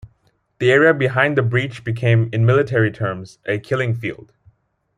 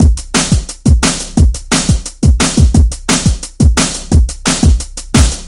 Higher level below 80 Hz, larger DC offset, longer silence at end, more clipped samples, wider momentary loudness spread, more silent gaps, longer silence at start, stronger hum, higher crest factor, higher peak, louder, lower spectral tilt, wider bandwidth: second, -56 dBFS vs -14 dBFS; neither; first, 0.85 s vs 0 s; neither; first, 12 LU vs 3 LU; neither; about the same, 0.05 s vs 0 s; neither; first, 18 dB vs 10 dB; about the same, -2 dBFS vs 0 dBFS; second, -18 LUFS vs -12 LUFS; first, -7.5 dB/octave vs -4.5 dB/octave; second, 9.6 kHz vs 11.5 kHz